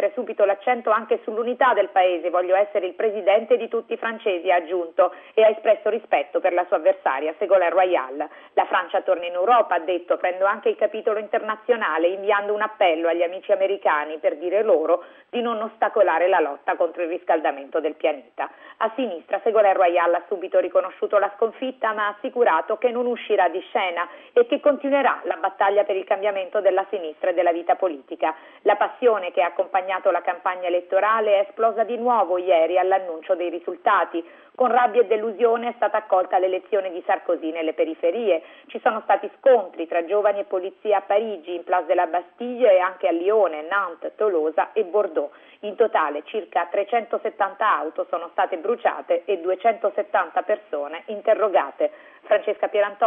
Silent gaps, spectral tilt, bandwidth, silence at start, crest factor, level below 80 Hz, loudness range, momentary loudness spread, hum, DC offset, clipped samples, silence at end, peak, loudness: none; -6.5 dB/octave; 3.8 kHz; 0 s; 14 dB; -82 dBFS; 2 LU; 8 LU; none; under 0.1%; under 0.1%; 0 s; -6 dBFS; -22 LUFS